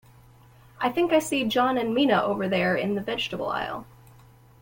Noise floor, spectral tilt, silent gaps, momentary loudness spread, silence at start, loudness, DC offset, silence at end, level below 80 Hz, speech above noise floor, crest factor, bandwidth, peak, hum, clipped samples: -53 dBFS; -5 dB/octave; none; 7 LU; 0.8 s; -25 LUFS; under 0.1%; 0.8 s; -58 dBFS; 28 dB; 18 dB; 17 kHz; -8 dBFS; none; under 0.1%